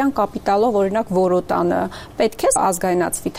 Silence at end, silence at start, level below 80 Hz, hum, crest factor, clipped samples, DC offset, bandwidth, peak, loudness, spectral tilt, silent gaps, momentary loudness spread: 0 s; 0 s; -46 dBFS; none; 12 dB; under 0.1%; under 0.1%; 16 kHz; -6 dBFS; -19 LUFS; -5 dB/octave; none; 5 LU